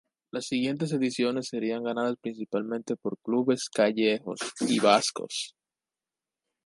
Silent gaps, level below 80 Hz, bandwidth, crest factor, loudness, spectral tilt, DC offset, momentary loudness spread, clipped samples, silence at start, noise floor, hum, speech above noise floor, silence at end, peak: none; -76 dBFS; 11.5 kHz; 22 dB; -28 LUFS; -4 dB/octave; under 0.1%; 11 LU; under 0.1%; 0.35 s; under -90 dBFS; none; over 62 dB; 1.15 s; -6 dBFS